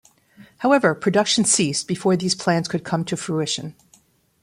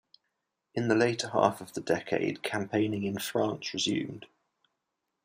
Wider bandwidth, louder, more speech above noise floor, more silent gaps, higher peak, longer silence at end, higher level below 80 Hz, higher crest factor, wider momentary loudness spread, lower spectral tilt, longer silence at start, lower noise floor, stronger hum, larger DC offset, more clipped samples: about the same, 15.5 kHz vs 15.5 kHz; first, -20 LUFS vs -30 LUFS; second, 37 dB vs 54 dB; neither; first, -4 dBFS vs -8 dBFS; second, 0.7 s vs 1 s; first, -62 dBFS vs -72 dBFS; about the same, 18 dB vs 22 dB; about the same, 8 LU vs 9 LU; about the same, -4 dB/octave vs -4.5 dB/octave; second, 0.4 s vs 0.75 s; second, -58 dBFS vs -84 dBFS; neither; neither; neither